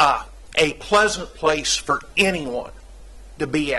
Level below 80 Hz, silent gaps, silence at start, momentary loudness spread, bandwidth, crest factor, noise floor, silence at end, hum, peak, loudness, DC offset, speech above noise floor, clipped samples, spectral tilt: -42 dBFS; none; 0 s; 11 LU; 12.5 kHz; 20 dB; -41 dBFS; 0 s; none; -2 dBFS; -21 LUFS; under 0.1%; 19 dB; under 0.1%; -2.5 dB/octave